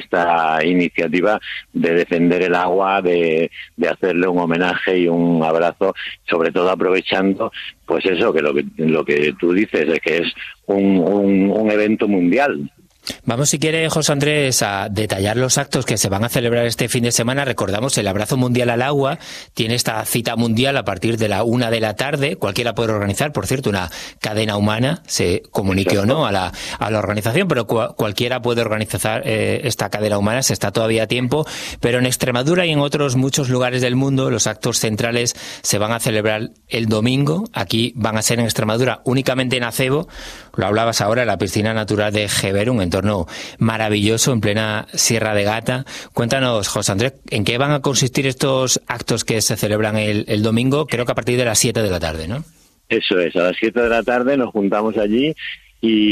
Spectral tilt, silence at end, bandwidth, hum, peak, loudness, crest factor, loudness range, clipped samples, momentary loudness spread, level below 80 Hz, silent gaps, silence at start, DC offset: -4.5 dB/octave; 0 s; 15 kHz; none; 0 dBFS; -18 LUFS; 18 dB; 2 LU; under 0.1%; 6 LU; -46 dBFS; none; 0 s; under 0.1%